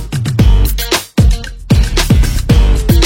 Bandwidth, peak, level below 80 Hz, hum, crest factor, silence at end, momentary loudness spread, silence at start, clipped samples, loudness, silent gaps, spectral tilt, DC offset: 17 kHz; 0 dBFS; -12 dBFS; none; 10 dB; 0 s; 4 LU; 0 s; under 0.1%; -12 LUFS; none; -5.5 dB/octave; under 0.1%